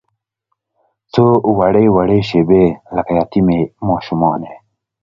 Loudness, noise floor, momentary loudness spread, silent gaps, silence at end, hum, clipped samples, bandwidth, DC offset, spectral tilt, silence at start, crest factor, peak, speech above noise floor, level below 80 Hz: -14 LUFS; -72 dBFS; 8 LU; none; 0.45 s; none; under 0.1%; 7.2 kHz; under 0.1%; -9 dB/octave; 1.15 s; 14 dB; 0 dBFS; 59 dB; -40 dBFS